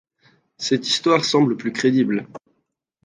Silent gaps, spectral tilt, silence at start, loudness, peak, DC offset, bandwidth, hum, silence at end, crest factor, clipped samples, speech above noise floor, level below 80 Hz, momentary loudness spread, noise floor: none; -4.5 dB/octave; 0.6 s; -19 LUFS; -2 dBFS; under 0.1%; 9.8 kHz; none; 0.7 s; 20 dB; under 0.1%; 54 dB; -68 dBFS; 10 LU; -73 dBFS